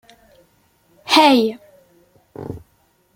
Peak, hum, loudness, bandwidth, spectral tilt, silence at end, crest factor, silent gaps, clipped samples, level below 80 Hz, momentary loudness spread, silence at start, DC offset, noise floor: 0 dBFS; none; -14 LUFS; 16.5 kHz; -3.5 dB/octave; 0.6 s; 20 dB; none; under 0.1%; -58 dBFS; 26 LU; 1.05 s; under 0.1%; -60 dBFS